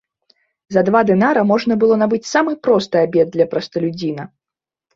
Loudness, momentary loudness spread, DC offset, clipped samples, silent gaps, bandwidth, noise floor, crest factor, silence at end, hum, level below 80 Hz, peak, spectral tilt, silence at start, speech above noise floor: -16 LUFS; 9 LU; under 0.1%; under 0.1%; none; 7.8 kHz; -88 dBFS; 16 dB; 0.7 s; none; -58 dBFS; -2 dBFS; -6 dB/octave; 0.7 s; 72 dB